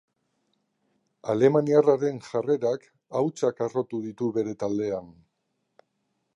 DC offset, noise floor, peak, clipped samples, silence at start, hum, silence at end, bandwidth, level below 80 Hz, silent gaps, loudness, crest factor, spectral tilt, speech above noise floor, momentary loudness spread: under 0.1%; -77 dBFS; -6 dBFS; under 0.1%; 1.25 s; none; 1.25 s; 9.6 kHz; -70 dBFS; none; -26 LUFS; 20 dB; -7.5 dB/octave; 52 dB; 12 LU